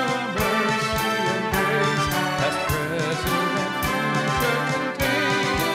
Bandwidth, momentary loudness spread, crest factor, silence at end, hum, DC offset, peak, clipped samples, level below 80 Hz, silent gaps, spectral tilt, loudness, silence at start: 16 kHz; 3 LU; 14 dB; 0 s; none; under 0.1%; -8 dBFS; under 0.1%; -42 dBFS; none; -4 dB/octave; -22 LUFS; 0 s